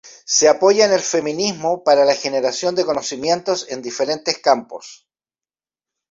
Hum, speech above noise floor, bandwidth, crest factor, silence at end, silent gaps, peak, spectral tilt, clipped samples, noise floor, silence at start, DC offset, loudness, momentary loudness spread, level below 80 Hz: none; over 73 dB; 7.8 kHz; 16 dB; 1.15 s; none; -2 dBFS; -2.5 dB/octave; under 0.1%; under -90 dBFS; 0.05 s; under 0.1%; -17 LUFS; 9 LU; -64 dBFS